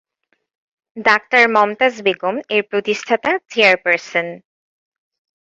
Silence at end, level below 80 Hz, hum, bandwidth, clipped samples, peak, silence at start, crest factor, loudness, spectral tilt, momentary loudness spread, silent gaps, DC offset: 1.05 s; -64 dBFS; none; 8 kHz; under 0.1%; 0 dBFS; 0.95 s; 18 dB; -16 LUFS; -3.5 dB/octave; 9 LU; none; under 0.1%